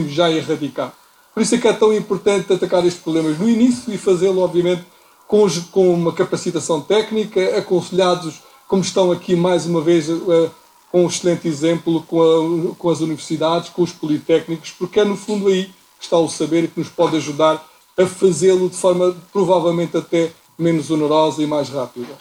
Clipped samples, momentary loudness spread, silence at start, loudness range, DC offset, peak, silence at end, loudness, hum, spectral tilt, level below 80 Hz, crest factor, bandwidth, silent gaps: under 0.1%; 7 LU; 0 s; 2 LU; under 0.1%; -2 dBFS; 0.05 s; -17 LUFS; none; -5.5 dB/octave; -60 dBFS; 16 dB; 15.5 kHz; none